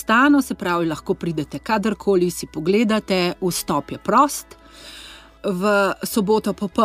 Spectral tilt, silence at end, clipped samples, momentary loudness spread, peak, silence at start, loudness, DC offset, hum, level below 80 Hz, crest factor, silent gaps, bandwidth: -5 dB/octave; 0 s; under 0.1%; 13 LU; -4 dBFS; 0 s; -20 LUFS; under 0.1%; none; -50 dBFS; 16 dB; none; 16 kHz